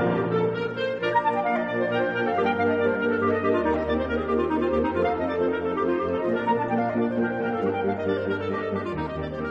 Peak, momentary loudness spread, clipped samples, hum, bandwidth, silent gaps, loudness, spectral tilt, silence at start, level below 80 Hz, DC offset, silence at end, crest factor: -10 dBFS; 4 LU; under 0.1%; none; 7 kHz; none; -25 LUFS; -8 dB/octave; 0 s; -48 dBFS; under 0.1%; 0 s; 14 dB